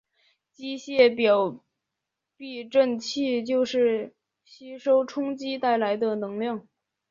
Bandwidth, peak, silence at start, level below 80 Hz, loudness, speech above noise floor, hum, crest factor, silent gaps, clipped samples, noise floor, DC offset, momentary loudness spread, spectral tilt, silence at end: 7.6 kHz; -6 dBFS; 0.6 s; -74 dBFS; -25 LUFS; 60 dB; none; 20 dB; none; under 0.1%; -85 dBFS; under 0.1%; 17 LU; -4.5 dB/octave; 0.5 s